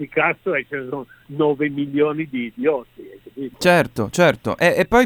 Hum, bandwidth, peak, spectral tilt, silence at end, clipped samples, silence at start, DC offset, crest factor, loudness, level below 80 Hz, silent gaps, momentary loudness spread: none; 19.5 kHz; 0 dBFS; -5.5 dB/octave; 0 s; under 0.1%; 0 s; under 0.1%; 20 dB; -19 LUFS; -48 dBFS; none; 15 LU